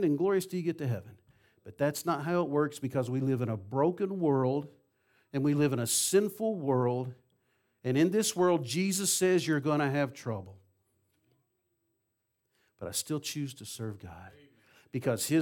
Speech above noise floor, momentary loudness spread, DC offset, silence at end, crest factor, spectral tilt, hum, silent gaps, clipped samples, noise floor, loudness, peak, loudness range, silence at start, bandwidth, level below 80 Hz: 51 dB; 13 LU; under 0.1%; 0 s; 16 dB; -5 dB/octave; none; none; under 0.1%; -81 dBFS; -30 LUFS; -14 dBFS; 11 LU; 0 s; 18 kHz; -74 dBFS